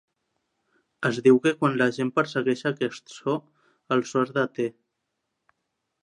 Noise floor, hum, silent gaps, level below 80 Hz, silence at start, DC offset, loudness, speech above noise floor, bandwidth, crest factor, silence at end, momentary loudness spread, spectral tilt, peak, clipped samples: -80 dBFS; none; none; -76 dBFS; 1 s; under 0.1%; -25 LUFS; 56 dB; 10.5 kHz; 20 dB; 1.35 s; 12 LU; -6 dB/octave; -6 dBFS; under 0.1%